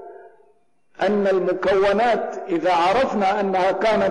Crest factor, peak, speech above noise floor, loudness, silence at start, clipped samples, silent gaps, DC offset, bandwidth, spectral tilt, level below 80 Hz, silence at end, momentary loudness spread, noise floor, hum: 6 dB; -14 dBFS; 43 dB; -20 LUFS; 0 s; under 0.1%; none; under 0.1%; 10.5 kHz; -5.5 dB/octave; -52 dBFS; 0 s; 5 LU; -62 dBFS; none